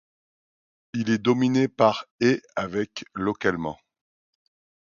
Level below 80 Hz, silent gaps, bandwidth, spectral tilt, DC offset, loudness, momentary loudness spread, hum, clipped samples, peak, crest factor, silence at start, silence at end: -60 dBFS; 2.11-2.19 s; 7.2 kHz; -6 dB/octave; under 0.1%; -25 LUFS; 11 LU; none; under 0.1%; -4 dBFS; 22 dB; 0.95 s; 1.15 s